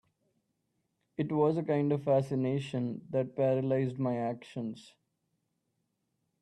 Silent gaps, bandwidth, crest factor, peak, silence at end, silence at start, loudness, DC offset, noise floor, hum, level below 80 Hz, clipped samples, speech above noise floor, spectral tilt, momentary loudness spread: none; 11 kHz; 18 dB; -16 dBFS; 1.6 s; 1.2 s; -32 LUFS; under 0.1%; -81 dBFS; none; -74 dBFS; under 0.1%; 50 dB; -8.5 dB/octave; 11 LU